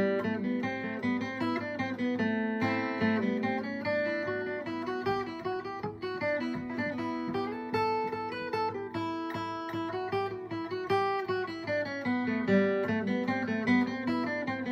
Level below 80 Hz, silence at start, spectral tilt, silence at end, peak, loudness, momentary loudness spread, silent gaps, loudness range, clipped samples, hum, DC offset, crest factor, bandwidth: -68 dBFS; 0 s; -7 dB/octave; 0 s; -14 dBFS; -32 LUFS; 7 LU; none; 4 LU; under 0.1%; none; under 0.1%; 18 dB; 8.4 kHz